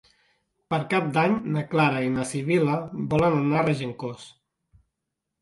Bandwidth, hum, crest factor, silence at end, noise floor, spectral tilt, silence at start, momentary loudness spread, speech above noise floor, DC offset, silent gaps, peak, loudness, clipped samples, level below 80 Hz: 11.5 kHz; none; 18 dB; 1.15 s; -83 dBFS; -6.5 dB/octave; 0.7 s; 9 LU; 59 dB; under 0.1%; none; -8 dBFS; -24 LUFS; under 0.1%; -56 dBFS